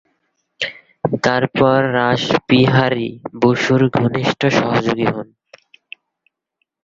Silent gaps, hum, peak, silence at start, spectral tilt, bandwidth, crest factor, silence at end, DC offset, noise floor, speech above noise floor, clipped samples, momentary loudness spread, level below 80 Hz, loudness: none; none; 0 dBFS; 0.6 s; -6.5 dB/octave; 7.6 kHz; 16 dB; 1.6 s; under 0.1%; -73 dBFS; 57 dB; under 0.1%; 11 LU; -52 dBFS; -16 LUFS